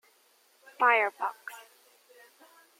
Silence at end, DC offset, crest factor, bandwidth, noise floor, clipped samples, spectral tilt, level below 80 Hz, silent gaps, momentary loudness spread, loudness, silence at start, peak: 1.2 s; under 0.1%; 22 dB; 16.5 kHz; -65 dBFS; under 0.1%; -1 dB/octave; under -90 dBFS; none; 22 LU; -27 LUFS; 0.8 s; -10 dBFS